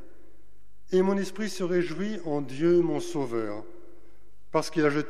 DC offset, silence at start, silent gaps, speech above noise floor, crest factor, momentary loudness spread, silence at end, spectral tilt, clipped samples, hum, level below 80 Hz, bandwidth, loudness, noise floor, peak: 2%; 0.9 s; none; 34 dB; 18 dB; 9 LU; 0 s; -6 dB/octave; under 0.1%; none; -62 dBFS; 13.5 kHz; -28 LUFS; -61 dBFS; -12 dBFS